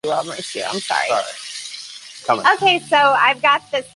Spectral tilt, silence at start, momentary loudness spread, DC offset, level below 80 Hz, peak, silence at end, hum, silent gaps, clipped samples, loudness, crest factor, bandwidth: -2 dB/octave; 0.05 s; 15 LU; under 0.1%; -68 dBFS; -2 dBFS; 0.1 s; none; none; under 0.1%; -17 LUFS; 18 dB; 11.5 kHz